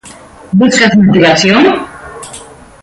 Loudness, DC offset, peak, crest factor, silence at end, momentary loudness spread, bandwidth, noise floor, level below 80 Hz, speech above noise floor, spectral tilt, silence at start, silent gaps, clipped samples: -8 LUFS; under 0.1%; 0 dBFS; 10 dB; 0.4 s; 21 LU; 11.5 kHz; -34 dBFS; -44 dBFS; 27 dB; -5 dB/octave; 0.05 s; none; under 0.1%